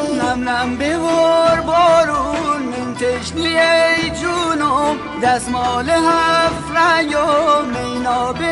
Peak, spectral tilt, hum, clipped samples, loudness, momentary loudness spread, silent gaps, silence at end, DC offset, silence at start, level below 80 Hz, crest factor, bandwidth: -4 dBFS; -4 dB/octave; none; under 0.1%; -15 LUFS; 7 LU; none; 0 s; under 0.1%; 0 s; -42 dBFS; 12 dB; 11.5 kHz